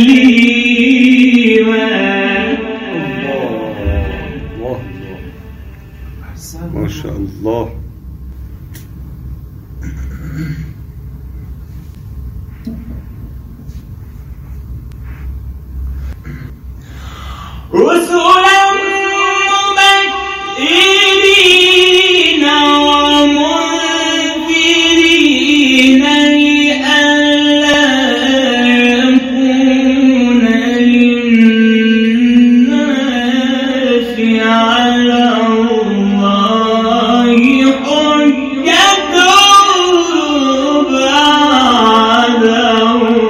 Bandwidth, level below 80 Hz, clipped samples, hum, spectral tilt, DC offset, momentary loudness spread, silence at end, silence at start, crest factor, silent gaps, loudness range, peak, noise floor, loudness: 15.5 kHz; -32 dBFS; 0.2%; none; -3.5 dB/octave; under 0.1%; 23 LU; 0 s; 0 s; 10 dB; none; 20 LU; 0 dBFS; -31 dBFS; -9 LUFS